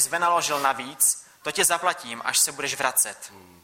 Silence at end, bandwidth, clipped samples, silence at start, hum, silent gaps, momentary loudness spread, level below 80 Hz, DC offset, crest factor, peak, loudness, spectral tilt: 0.2 s; 16.5 kHz; under 0.1%; 0 s; none; none; 9 LU; -68 dBFS; under 0.1%; 20 dB; -4 dBFS; -23 LUFS; 0 dB/octave